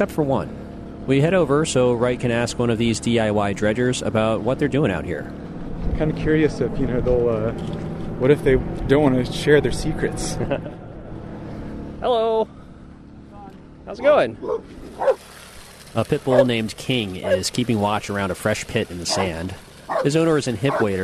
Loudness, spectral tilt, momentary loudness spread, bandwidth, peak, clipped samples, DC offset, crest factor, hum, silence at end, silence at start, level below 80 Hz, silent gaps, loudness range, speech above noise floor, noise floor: -21 LUFS; -5.5 dB/octave; 17 LU; 13.5 kHz; -2 dBFS; under 0.1%; under 0.1%; 20 dB; none; 0 s; 0 s; -36 dBFS; none; 4 LU; 21 dB; -41 dBFS